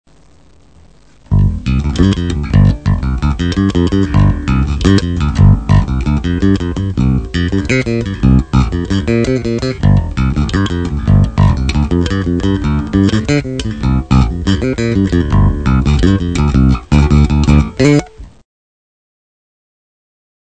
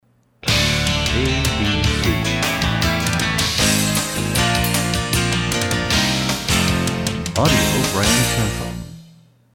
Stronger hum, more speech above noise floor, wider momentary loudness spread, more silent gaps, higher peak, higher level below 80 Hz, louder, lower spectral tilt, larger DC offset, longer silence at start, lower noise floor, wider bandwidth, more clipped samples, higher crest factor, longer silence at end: neither; about the same, 35 dB vs 32 dB; about the same, 5 LU vs 5 LU; neither; about the same, 0 dBFS vs -2 dBFS; first, -18 dBFS vs -30 dBFS; first, -13 LUFS vs -18 LUFS; first, -7.5 dB/octave vs -3.5 dB/octave; first, 0.5% vs under 0.1%; first, 1.3 s vs 0.45 s; about the same, -46 dBFS vs -49 dBFS; second, 9 kHz vs 20 kHz; first, 0.4% vs under 0.1%; about the same, 12 dB vs 16 dB; first, 2.15 s vs 0.5 s